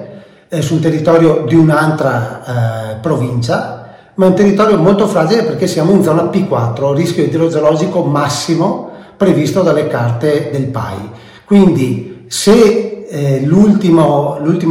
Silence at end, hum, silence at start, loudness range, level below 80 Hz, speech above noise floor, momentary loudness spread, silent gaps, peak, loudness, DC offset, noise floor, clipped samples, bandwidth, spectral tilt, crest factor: 0 s; none; 0 s; 3 LU; -46 dBFS; 22 dB; 11 LU; none; 0 dBFS; -12 LUFS; under 0.1%; -33 dBFS; under 0.1%; 16 kHz; -6.5 dB/octave; 12 dB